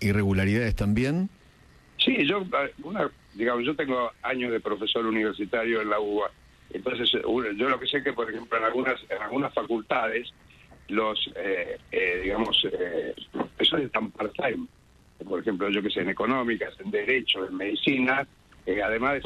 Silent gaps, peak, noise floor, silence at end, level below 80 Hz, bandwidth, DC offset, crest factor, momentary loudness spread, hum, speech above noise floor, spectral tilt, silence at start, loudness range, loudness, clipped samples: none; -10 dBFS; -55 dBFS; 0 s; -48 dBFS; 13 kHz; under 0.1%; 18 dB; 9 LU; none; 28 dB; -6 dB/octave; 0 s; 2 LU; -27 LUFS; under 0.1%